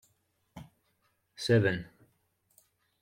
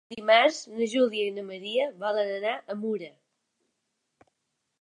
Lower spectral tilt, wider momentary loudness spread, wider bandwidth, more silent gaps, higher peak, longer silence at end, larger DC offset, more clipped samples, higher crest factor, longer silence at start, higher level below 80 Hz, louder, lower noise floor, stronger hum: first, -6 dB/octave vs -3.5 dB/octave; first, 26 LU vs 12 LU; first, 13.5 kHz vs 11 kHz; neither; second, -14 dBFS vs -8 dBFS; second, 1.15 s vs 1.7 s; neither; neither; about the same, 20 dB vs 20 dB; first, 0.55 s vs 0.1 s; first, -66 dBFS vs -82 dBFS; about the same, -29 LUFS vs -27 LUFS; second, -75 dBFS vs -80 dBFS; neither